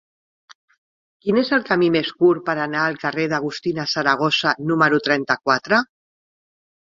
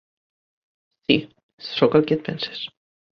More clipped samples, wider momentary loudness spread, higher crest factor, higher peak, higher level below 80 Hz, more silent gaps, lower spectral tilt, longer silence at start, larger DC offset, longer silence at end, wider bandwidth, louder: neither; second, 6 LU vs 15 LU; about the same, 20 dB vs 22 dB; about the same, -2 dBFS vs -2 dBFS; about the same, -64 dBFS vs -62 dBFS; second, none vs 1.43-1.58 s; second, -5 dB/octave vs -7.5 dB/octave; first, 1.25 s vs 1.1 s; neither; first, 1 s vs 0.5 s; first, 7.6 kHz vs 6.4 kHz; first, -19 LUFS vs -22 LUFS